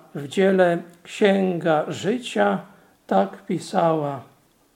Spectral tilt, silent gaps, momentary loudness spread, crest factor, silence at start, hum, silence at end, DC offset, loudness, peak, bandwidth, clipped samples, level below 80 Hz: -6 dB/octave; none; 11 LU; 20 dB; 0.15 s; none; 0.5 s; under 0.1%; -22 LUFS; -4 dBFS; 13.5 kHz; under 0.1%; -72 dBFS